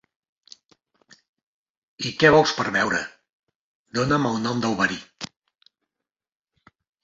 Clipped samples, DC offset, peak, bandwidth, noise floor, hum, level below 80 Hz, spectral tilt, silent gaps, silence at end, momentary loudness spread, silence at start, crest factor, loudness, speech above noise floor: under 0.1%; under 0.1%; -2 dBFS; 7.8 kHz; -87 dBFS; none; -56 dBFS; -4.5 dB/octave; 3.33-3.47 s, 3.55-3.85 s; 1.8 s; 21 LU; 2 s; 24 dB; -22 LUFS; 66 dB